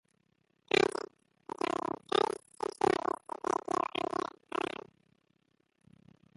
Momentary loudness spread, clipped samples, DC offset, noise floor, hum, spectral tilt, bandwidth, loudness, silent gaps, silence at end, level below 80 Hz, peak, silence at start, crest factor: 13 LU; under 0.1%; under 0.1%; -75 dBFS; none; -3.5 dB/octave; 11.5 kHz; -34 LUFS; none; 2.35 s; -72 dBFS; -12 dBFS; 0.75 s; 24 dB